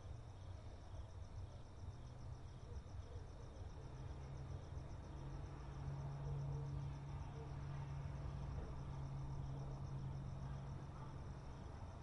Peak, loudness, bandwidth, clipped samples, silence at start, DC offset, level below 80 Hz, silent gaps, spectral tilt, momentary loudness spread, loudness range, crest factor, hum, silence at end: -36 dBFS; -51 LUFS; 10.5 kHz; under 0.1%; 0 s; under 0.1%; -56 dBFS; none; -7.5 dB/octave; 7 LU; 6 LU; 14 dB; none; 0 s